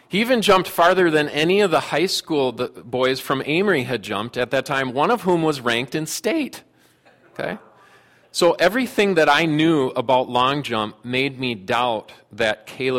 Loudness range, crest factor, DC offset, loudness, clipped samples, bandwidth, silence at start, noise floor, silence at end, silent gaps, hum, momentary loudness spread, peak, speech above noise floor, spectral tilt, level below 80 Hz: 5 LU; 16 dB; under 0.1%; -20 LUFS; under 0.1%; 16.5 kHz; 0.1 s; -55 dBFS; 0 s; none; none; 10 LU; -4 dBFS; 35 dB; -4.5 dB/octave; -58 dBFS